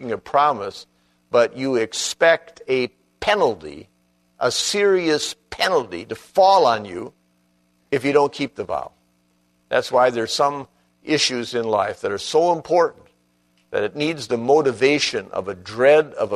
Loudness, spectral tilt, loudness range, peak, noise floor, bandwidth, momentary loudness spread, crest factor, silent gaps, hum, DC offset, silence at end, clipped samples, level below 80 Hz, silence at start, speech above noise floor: -20 LUFS; -3.5 dB/octave; 3 LU; -2 dBFS; -63 dBFS; 13.5 kHz; 12 LU; 18 dB; none; 60 Hz at -60 dBFS; under 0.1%; 0 s; under 0.1%; -60 dBFS; 0 s; 44 dB